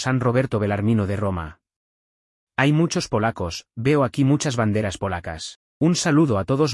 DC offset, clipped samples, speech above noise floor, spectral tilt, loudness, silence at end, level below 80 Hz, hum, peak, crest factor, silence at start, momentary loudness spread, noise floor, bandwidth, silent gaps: under 0.1%; under 0.1%; over 69 dB; -6 dB/octave; -21 LUFS; 0 s; -50 dBFS; none; -4 dBFS; 18 dB; 0 s; 11 LU; under -90 dBFS; 12 kHz; 1.76-2.47 s, 5.56-5.81 s